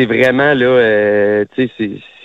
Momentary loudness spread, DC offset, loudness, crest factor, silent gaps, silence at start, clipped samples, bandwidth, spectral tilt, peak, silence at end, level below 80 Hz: 9 LU; under 0.1%; -13 LUFS; 12 dB; none; 0 s; under 0.1%; 7.8 kHz; -7 dB/octave; 0 dBFS; 0.25 s; -50 dBFS